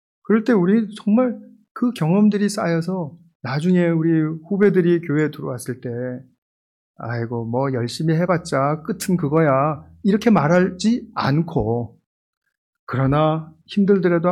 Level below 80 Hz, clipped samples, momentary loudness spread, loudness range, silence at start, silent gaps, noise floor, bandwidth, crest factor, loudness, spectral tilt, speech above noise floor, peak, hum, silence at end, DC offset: -50 dBFS; under 0.1%; 12 LU; 5 LU; 0.3 s; 1.71-1.75 s, 3.35-3.40 s, 6.38-6.94 s, 12.06-12.41 s, 12.58-12.73 s, 12.79-12.87 s; under -90 dBFS; 13.5 kHz; 14 dB; -20 LUFS; -7 dB/octave; over 71 dB; -4 dBFS; none; 0 s; under 0.1%